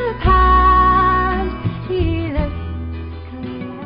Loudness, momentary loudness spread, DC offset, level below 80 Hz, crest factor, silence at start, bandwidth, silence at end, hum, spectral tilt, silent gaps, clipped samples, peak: -16 LUFS; 17 LU; under 0.1%; -24 dBFS; 14 dB; 0 s; 5.2 kHz; 0 s; none; -11.5 dB/octave; none; under 0.1%; -2 dBFS